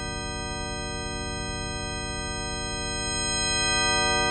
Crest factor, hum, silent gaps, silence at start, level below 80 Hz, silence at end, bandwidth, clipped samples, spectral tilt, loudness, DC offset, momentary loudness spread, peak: 18 dB; none; none; 0 s; -38 dBFS; 0 s; 8.8 kHz; under 0.1%; -2 dB/octave; -27 LUFS; under 0.1%; 10 LU; -12 dBFS